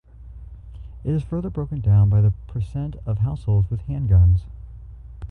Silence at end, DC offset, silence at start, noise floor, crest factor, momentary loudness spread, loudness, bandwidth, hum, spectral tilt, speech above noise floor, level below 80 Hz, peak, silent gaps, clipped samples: 0 s; under 0.1%; 0.2 s; -40 dBFS; 14 dB; 25 LU; -21 LUFS; 2.9 kHz; none; -11 dB/octave; 20 dB; -30 dBFS; -8 dBFS; none; under 0.1%